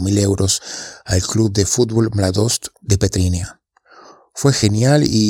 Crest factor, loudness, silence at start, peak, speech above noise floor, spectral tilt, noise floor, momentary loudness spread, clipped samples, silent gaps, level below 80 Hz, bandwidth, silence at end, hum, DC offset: 16 dB; -17 LUFS; 0 s; 0 dBFS; 30 dB; -5 dB/octave; -46 dBFS; 9 LU; under 0.1%; none; -38 dBFS; 16.5 kHz; 0 s; none; under 0.1%